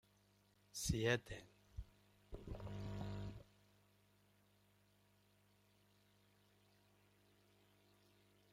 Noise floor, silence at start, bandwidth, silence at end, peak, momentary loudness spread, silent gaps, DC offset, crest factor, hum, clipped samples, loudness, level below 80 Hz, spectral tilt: -75 dBFS; 0.75 s; 16 kHz; 5.1 s; -22 dBFS; 20 LU; none; under 0.1%; 28 dB; 50 Hz at -65 dBFS; under 0.1%; -45 LUFS; -62 dBFS; -4.5 dB/octave